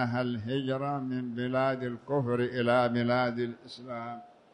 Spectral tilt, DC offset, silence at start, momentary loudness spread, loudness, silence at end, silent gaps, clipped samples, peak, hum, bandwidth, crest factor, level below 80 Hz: -8 dB/octave; under 0.1%; 0 s; 13 LU; -30 LUFS; 0.25 s; none; under 0.1%; -14 dBFS; none; 10 kHz; 16 dB; -68 dBFS